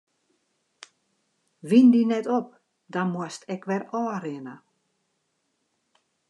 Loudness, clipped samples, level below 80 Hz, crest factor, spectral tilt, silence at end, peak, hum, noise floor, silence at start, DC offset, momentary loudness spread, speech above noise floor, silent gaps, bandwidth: -24 LUFS; under 0.1%; -86 dBFS; 20 dB; -7 dB/octave; 1.75 s; -6 dBFS; none; -75 dBFS; 1.65 s; under 0.1%; 22 LU; 52 dB; none; 10.5 kHz